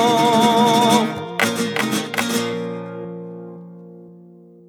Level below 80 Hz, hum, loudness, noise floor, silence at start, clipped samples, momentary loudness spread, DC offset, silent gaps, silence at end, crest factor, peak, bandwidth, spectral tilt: -66 dBFS; none; -18 LUFS; -45 dBFS; 0 s; under 0.1%; 21 LU; under 0.1%; none; 0.5 s; 18 dB; -2 dBFS; 19.5 kHz; -4 dB/octave